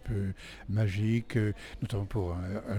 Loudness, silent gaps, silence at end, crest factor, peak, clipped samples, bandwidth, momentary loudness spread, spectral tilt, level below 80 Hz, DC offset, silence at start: -33 LUFS; none; 0 s; 14 dB; -18 dBFS; under 0.1%; 11.5 kHz; 8 LU; -7.5 dB/octave; -48 dBFS; under 0.1%; 0 s